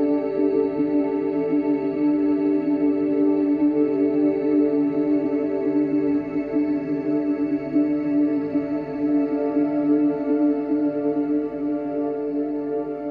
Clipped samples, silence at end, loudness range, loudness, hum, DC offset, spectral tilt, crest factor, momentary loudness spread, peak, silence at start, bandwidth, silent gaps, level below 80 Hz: under 0.1%; 0 s; 2 LU; -22 LUFS; none; under 0.1%; -10.5 dB/octave; 12 dB; 5 LU; -10 dBFS; 0 s; 4.7 kHz; none; -58 dBFS